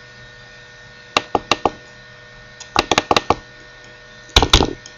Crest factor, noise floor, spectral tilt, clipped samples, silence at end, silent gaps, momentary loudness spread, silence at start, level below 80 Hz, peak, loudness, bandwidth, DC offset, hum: 22 dB; -41 dBFS; -3 dB/octave; under 0.1%; 0.2 s; none; 25 LU; 1.15 s; -30 dBFS; 0 dBFS; -17 LUFS; 16 kHz; under 0.1%; none